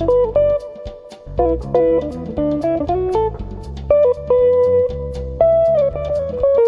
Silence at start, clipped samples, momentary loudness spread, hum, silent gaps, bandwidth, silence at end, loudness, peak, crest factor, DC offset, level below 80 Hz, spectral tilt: 0 s; under 0.1%; 16 LU; none; none; 6.8 kHz; 0 s; -17 LUFS; -2 dBFS; 14 dB; under 0.1%; -32 dBFS; -9 dB/octave